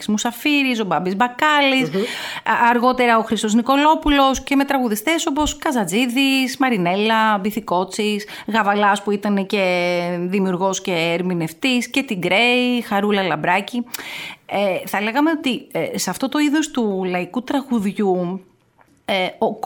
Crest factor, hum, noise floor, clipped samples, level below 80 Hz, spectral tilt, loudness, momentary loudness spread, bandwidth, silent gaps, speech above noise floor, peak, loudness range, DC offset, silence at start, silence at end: 16 dB; none; -56 dBFS; under 0.1%; -44 dBFS; -4 dB/octave; -18 LUFS; 8 LU; 19 kHz; none; 37 dB; -4 dBFS; 4 LU; under 0.1%; 0 s; 0 s